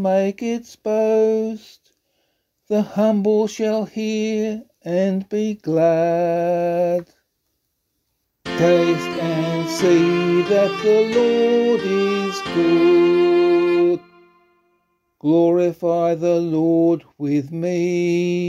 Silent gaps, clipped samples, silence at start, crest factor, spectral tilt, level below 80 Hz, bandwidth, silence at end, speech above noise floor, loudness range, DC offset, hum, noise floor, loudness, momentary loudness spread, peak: none; under 0.1%; 0 s; 16 dB; -6.5 dB/octave; -62 dBFS; 12 kHz; 0 s; 55 dB; 5 LU; under 0.1%; none; -72 dBFS; -18 LUFS; 8 LU; -4 dBFS